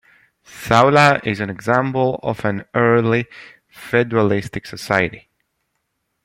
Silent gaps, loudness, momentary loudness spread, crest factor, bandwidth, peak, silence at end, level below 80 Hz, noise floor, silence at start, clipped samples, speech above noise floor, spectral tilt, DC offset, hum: none; -17 LUFS; 14 LU; 18 dB; 16.5 kHz; 0 dBFS; 1.05 s; -52 dBFS; -72 dBFS; 0.55 s; under 0.1%; 55 dB; -6 dB/octave; under 0.1%; none